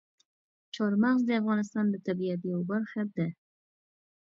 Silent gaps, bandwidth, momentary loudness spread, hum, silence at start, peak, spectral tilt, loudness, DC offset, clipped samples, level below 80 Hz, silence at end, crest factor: none; 7.6 kHz; 8 LU; none; 0.75 s; -14 dBFS; -7.5 dB/octave; -30 LUFS; under 0.1%; under 0.1%; -78 dBFS; 1 s; 16 dB